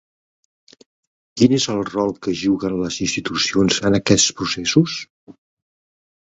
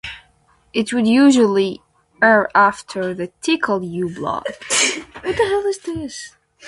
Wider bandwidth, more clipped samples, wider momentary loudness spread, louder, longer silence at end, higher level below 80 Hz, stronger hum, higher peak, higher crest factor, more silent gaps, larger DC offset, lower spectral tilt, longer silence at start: second, 8.4 kHz vs 11.5 kHz; neither; second, 7 LU vs 15 LU; about the same, -18 LUFS vs -18 LUFS; first, 0.95 s vs 0 s; about the same, -50 dBFS vs -52 dBFS; neither; about the same, 0 dBFS vs 0 dBFS; about the same, 20 dB vs 18 dB; first, 5.10-5.27 s vs none; neither; about the same, -4 dB/octave vs -3.5 dB/octave; first, 1.35 s vs 0.05 s